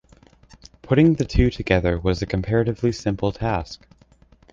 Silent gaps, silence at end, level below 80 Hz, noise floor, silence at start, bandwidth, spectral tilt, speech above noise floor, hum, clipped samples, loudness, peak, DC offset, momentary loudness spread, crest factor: none; 0.75 s; -34 dBFS; -54 dBFS; 0.85 s; 7.6 kHz; -7 dB/octave; 33 dB; none; under 0.1%; -21 LUFS; -2 dBFS; under 0.1%; 8 LU; 20 dB